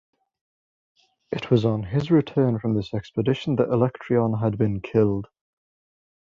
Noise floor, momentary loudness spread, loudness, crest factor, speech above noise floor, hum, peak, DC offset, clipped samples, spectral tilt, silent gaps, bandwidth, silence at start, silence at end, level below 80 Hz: under -90 dBFS; 6 LU; -23 LUFS; 20 dB; over 68 dB; none; -4 dBFS; under 0.1%; under 0.1%; -9 dB/octave; none; 7.2 kHz; 1.3 s; 1.1 s; -52 dBFS